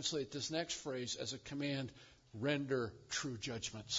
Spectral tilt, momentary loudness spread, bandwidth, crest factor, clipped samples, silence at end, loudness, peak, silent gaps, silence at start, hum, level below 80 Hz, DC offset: -3.5 dB/octave; 6 LU; 7.6 kHz; 20 dB; under 0.1%; 0 s; -41 LUFS; -20 dBFS; none; 0 s; none; -70 dBFS; under 0.1%